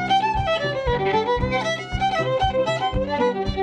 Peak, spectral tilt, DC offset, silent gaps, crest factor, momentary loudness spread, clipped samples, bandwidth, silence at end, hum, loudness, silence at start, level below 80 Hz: -8 dBFS; -5.5 dB/octave; under 0.1%; none; 14 dB; 3 LU; under 0.1%; 9.8 kHz; 0 s; none; -22 LUFS; 0 s; -34 dBFS